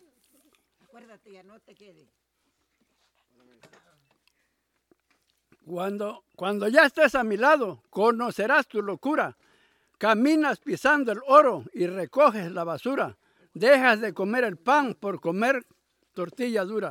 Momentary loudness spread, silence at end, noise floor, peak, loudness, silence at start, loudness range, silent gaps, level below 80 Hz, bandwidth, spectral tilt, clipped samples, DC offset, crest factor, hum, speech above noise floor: 13 LU; 0 s; -75 dBFS; -4 dBFS; -24 LUFS; 5.65 s; 5 LU; none; -70 dBFS; 16.5 kHz; -5 dB/octave; under 0.1%; under 0.1%; 22 dB; none; 51 dB